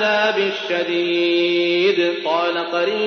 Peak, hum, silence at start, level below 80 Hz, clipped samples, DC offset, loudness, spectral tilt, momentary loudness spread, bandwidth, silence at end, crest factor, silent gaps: -6 dBFS; none; 0 s; -78 dBFS; under 0.1%; under 0.1%; -18 LUFS; -4.5 dB/octave; 4 LU; 6.6 kHz; 0 s; 12 dB; none